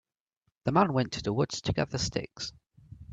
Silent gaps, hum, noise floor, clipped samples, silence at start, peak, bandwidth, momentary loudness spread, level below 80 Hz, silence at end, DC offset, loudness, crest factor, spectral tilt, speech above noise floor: none; none; -79 dBFS; under 0.1%; 0.65 s; -10 dBFS; 8.8 kHz; 13 LU; -52 dBFS; 0 s; under 0.1%; -30 LUFS; 22 dB; -5 dB/octave; 49 dB